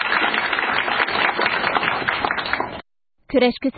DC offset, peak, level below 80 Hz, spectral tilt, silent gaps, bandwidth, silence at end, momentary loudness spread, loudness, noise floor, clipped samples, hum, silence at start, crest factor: under 0.1%; -4 dBFS; -52 dBFS; -8.5 dB/octave; none; 4.8 kHz; 0 s; 6 LU; -20 LUFS; -52 dBFS; under 0.1%; none; 0 s; 18 dB